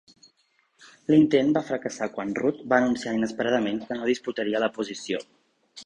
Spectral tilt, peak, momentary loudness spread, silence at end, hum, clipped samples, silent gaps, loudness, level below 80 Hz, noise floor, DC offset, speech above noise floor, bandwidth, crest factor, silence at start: -5.5 dB/octave; -4 dBFS; 11 LU; 0 s; none; under 0.1%; none; -25 LUFS; -64 dBFS; -68 dBFS; under 0.1%; 44 dB; 9.6 kHz; 22 dB; 1.1 s